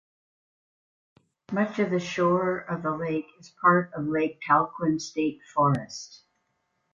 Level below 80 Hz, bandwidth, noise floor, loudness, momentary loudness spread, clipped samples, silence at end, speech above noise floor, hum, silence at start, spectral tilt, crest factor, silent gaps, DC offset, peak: -66 dBFS; 7.6 kHz; -75 dBFS; -26 LUFS; 11 LU; under 0.1%; 0.75 s; 49 dB; none; 1.5 s; -6.5 dB/octave; 20 dB; none; under 0.1%; -8 dBFS